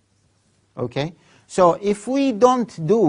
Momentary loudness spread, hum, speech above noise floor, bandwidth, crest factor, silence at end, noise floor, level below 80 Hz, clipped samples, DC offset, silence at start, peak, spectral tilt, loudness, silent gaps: 14 LU; none; 43 dB; 11 kHz; 20 dB; 0 s; -62 dBFS; -58 dBFS; under 0.1%; under 0.1%; 0.75 s; 0 dBFS; -6 dB/octave; -20 LUFS; none